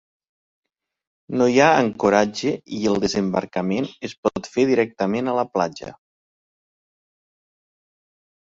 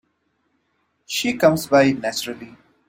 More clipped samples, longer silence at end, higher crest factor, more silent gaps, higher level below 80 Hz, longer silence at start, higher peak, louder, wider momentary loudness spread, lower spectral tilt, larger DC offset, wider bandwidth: neither; first, 2.65 s vs 0.4 s; about the same, 22 dB vs 20 dB; first, 4.17-4.23 s vs none; about the same, -58 dBFS vs -60 dBFS; first, 1.3 s vs 1.1 s; about the same, -2 dBFS vs -2 dBFS; about the same, -21 LUFS vs -19 LUFS; second, 10 LU vs 13 LU; about the same, -5.5 dB/octave vs -4.5 dB/octave; neither; second, 7.8 kHz vs 16.5 kHz